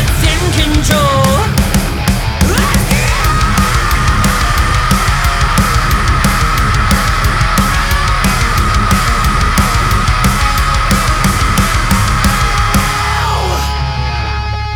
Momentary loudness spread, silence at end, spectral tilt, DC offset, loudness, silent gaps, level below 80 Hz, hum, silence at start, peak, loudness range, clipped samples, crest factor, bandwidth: 3 LU; 0 s; -4 dB/octave; under 0.1%; -12 LUFS; none; -16 dBFS; none; 0 s; 0 dBFS; 0 LU; under 0.1%; 10 dB; over 20 kHz